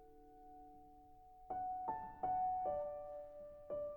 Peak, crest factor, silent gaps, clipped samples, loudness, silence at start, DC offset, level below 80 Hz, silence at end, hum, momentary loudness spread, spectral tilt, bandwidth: -30 dBFS; 14 dB; none; under 0.1%; -44 LUFS; 0 s; under 0.1%; -68 dBFS; 0 s; none; 23 LU; -8.5 dB/octave; 19 kHz